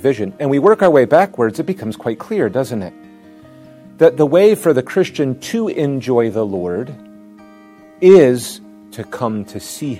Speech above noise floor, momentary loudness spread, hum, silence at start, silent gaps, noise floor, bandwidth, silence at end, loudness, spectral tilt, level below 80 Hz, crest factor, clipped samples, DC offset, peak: 28 dB; 16 LU; none; 0 s; none; -42 dBFS; 15.5 kHz; 0 s; -15 LUFS; -6.5 dB/octave; -60 dBFS; 16 dB; 0.2%; under 0.1%; 0 dBFS